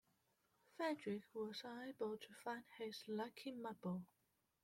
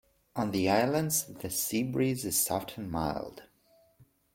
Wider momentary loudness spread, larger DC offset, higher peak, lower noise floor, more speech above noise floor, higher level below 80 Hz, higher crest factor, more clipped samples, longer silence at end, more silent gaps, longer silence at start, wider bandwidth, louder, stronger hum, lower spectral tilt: second, 6 LU vs 10 LU; neither; second, -32 dBFS vs -12 dBFS; first, -83 dBFS vs -65 dBFS; about the same, 34 dB vs 35 dB; second, -90 dBFS vs -58 dBFS; about the same, 18 dB vs 20 dB; neither; first, 0.6 s vs 0.3 s; neither; first, 0.75 s vs 0.35 s; about the same, 16.5 kHz vs 16.5 kHz; second, -49 LUFS vs -30 LUFS; neither; first, -5.5 dB/octave vs -4 dB/octave